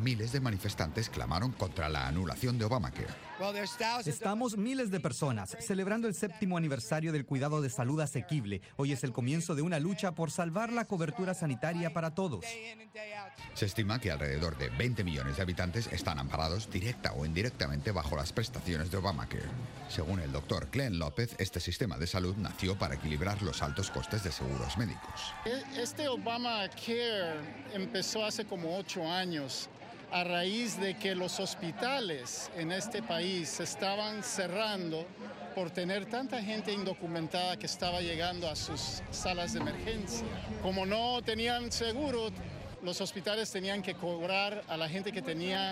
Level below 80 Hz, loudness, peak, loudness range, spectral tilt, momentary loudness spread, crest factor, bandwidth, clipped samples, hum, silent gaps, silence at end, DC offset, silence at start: -50 dBFS; -35 LUFS; -14 dBFS; 2 LU; -4.5 dB/octave; 5 LU; 20 dB; 16 kHz; under 0.1%; none; none; 0 s; under 0.1%; 0 s